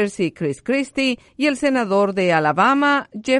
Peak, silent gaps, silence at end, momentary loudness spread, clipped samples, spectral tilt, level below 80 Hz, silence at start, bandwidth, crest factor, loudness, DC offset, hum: -2 dBFS; none; 0 s; 7 LU; under 0.1%; -5 dB/octave; -58 dBFS; 0 s; 11.5 kHz; 16 dB; -19 LUFS; under 0.1%; none